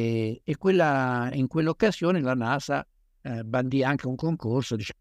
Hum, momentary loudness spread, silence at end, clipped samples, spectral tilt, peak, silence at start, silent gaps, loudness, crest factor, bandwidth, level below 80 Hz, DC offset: none; 8 LU; 0.1 s; under 0.1%; -7 dB/octave; -8 dBFS; 0 s; none; -26 LUFS; 18 dB; 13 kHz; -58 dBFS; under 0.1%